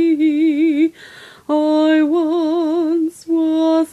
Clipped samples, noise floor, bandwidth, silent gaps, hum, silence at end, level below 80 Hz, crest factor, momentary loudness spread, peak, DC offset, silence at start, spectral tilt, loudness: under 0.1%; -40 dBFS; 11.5 kHz; none; none; 0.05 s; -66 dBFS; 10 dB; 6 LU; -6 dBFS; under 0.1%; 0 s; -4.5 dB/octave; -16 LUFS